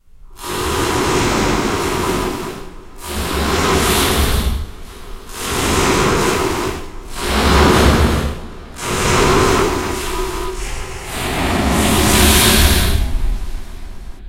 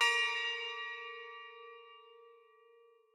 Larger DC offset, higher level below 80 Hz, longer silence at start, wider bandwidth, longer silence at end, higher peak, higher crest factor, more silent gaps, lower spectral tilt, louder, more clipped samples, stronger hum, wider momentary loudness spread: neither; first, -22 dBFS vs under -90 dBFS; first, 0.25 s vs 0 s; about the same, 16 kHz vs 15.5 kHz; second, 0 s vs 0.8 s; first, 0 dBFS vs -18 dBFS; second, 16 dB vs 22 dB; neither; first, -4 dB/octave vs 4.5 dB/octave; first, -16 LUFS vs -36 LUFS; neither; neither; second, 20 LU vs 25 LU